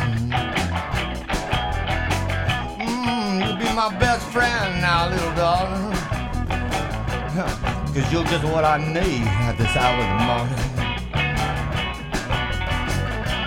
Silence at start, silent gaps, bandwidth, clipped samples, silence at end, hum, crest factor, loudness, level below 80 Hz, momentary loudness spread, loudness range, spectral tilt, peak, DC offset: 0 s; none; 16.5 kHz; under 0.1%; 0 s; none; 18 dB; -22 LUFS; -32 dBFS; 6 LU; 3 LU; -5 dB/octave; -4 dBFS; under 0.1%